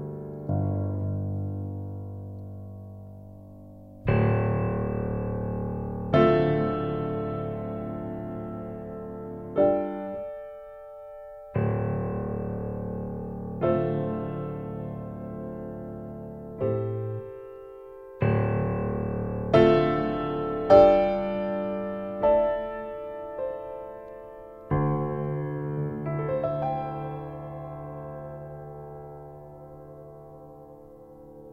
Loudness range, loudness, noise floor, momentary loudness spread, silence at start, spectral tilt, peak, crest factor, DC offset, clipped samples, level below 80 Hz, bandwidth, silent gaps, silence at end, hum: 12 LU; -28 LUFS; -48 dBFS; 21 LU; 0 s; -10 dB/octave; -4 dBFS; 24 dB; under 0.1%; under 0.1%; -48 dBFS; 6 kHz; none; 0 s; none